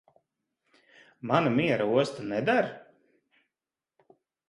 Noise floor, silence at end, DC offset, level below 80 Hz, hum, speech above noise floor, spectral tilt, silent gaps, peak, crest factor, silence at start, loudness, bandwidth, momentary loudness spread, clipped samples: under -90 dBFS; 1.7 s; under 0.1%; -70 dBFS; none; over 64 dB; -6.5 dB/octave; none; -8 dBFS; 22 dB; 1.25 s; -27 LUFS; 11.5 kHz; 11 LU; under 0.1%